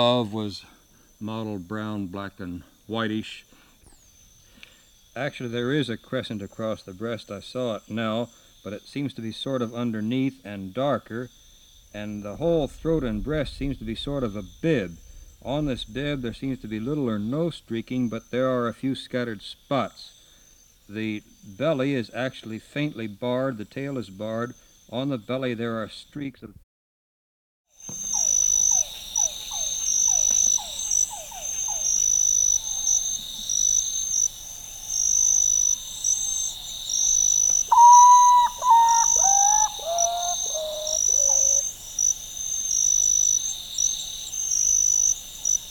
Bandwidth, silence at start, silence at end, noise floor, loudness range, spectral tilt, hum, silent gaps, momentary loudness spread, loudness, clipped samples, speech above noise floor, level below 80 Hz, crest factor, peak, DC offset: over 20 kHz; 0 s; 0 s; -55 dBFS; 15 LU; -2.5 dB/octave; none; 26.63-27.65 s; 17 LU; -22 LUFS; under 0.1%; 27 dB; -50 dBFS; 20 dB; -4 dBFS; under 0.1%